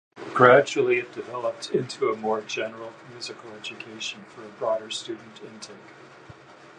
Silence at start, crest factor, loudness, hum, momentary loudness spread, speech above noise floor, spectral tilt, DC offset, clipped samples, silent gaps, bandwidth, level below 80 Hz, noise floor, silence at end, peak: 0.15 s; 24 dB; -24 LUFS; none; 23 LU; 22 dB; -4.5 dB/octave; under 0.1%; under 0.1%; none; 10.5 kHz; -72 dBFS; -48 dBFS; 0.45 s; -2 dBFS